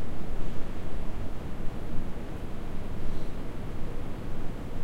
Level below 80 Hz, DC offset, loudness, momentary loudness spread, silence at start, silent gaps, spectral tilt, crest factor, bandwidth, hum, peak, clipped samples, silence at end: -34 dBFS; under 0.1%; -39 LUFS; 1 LU; 0 s; none; -7 dB/octave; 10 dB; 4.7 kHz; none; -14 dBFS; under 0.1%; 0 s